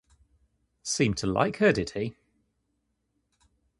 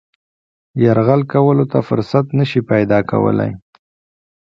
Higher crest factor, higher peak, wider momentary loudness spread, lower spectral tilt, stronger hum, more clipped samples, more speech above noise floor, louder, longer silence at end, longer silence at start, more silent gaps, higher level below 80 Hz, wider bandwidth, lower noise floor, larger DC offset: first, 24 dB vs 16 dB; second, -8 dBFS vs 0 dBFS; first, 12 LU vs 6 LU; second, -4.5 dB/octave vs -9.5 dB/octave; neither; neither; second, 51 dB vs over 76 dB; second, -27 LUFS vs -15 LUFS; first, 1.7 s vs 0.85 s; about the same, 0.85 s vs 0.75 s; neither; about the same, -54 dBFS vs -50 dBFS; first, 11.5 kHz vs 6.4 kHz; second, -77 dBFS vs under -90 dBFS; neither